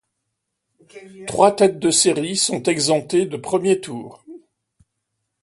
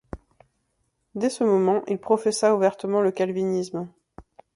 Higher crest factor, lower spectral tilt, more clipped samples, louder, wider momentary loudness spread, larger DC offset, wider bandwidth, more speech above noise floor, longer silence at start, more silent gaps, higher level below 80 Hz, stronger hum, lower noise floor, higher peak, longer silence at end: about the same, 20 dB vs 18 dB; second, -3.5 dB/octave vs -5.5 dB/octave; neither; first, -18 LUFS vs -23 LUFS; about the same, 17 LU vs 18 LU; neither; about the same, 11.5 kHz vs 11.5 kHz; first, 58 dB vs 50 dB; first, 0.95 s vs 0.15 s; neither; second, -62 dBFS vs -56 dBFS; neither; first, -77 dBFS vs -73 dBFS; first, 0 dBFS vs -6 dBFS; first, 1.05 s vs 0.35 s